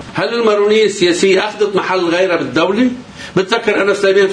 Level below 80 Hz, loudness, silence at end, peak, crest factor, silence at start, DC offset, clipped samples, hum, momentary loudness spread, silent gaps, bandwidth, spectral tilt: -52 dBFS; -13 LUFS; 0 s; 0 dBFS; 14 dB; 0 s; under 0.1%; under 0.1%; none; 6 LU; none; 10 kHz; -4.5 dB/octave